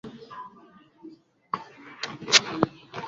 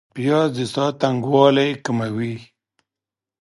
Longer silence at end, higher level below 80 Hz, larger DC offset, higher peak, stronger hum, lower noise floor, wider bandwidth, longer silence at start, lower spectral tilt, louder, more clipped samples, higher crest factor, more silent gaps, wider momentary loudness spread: second, 0 s vs 0.95 s; about the same, -64 dBFS vs -64 dBFS; neither; about the same, -2 dBFS vs -2 dBFS; neither; second, -54 dBFS vs -88 dBFS; second, 7.4 kHz vs 11.5 kHz; about the same, 0.05 s vs 0.15 s; second, -1 dB/octave vs -6.5 dB/octave; second, -25 LUFS vs -19 LUFS; neither; first, 28 dB vs 20 dB; neither; first, 23 LU vs 11 LU